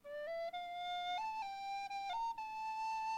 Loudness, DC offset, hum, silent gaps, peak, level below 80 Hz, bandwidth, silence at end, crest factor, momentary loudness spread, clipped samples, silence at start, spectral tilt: -43 LUFS; under 0.1%; none; none; -34 dBFS; -74 dBFS; 16.5 kHz; 0 s; 8 dB; 3 LU; under 0.1%; 0.05 s; -1 dB/octave